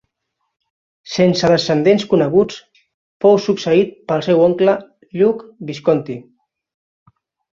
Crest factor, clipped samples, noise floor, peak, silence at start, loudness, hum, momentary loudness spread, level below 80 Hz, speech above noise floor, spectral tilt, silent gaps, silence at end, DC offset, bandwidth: 16 dB; under 0.1%; -74 dBFS; -2 dBFS; 1.05 s; -16 LUFS; none; 13 LU; -56 dBFS; 59 dB; -6 dB/octave; 2.94-3.20 s; 1.35 s; under 0.1%; 7.6 kHz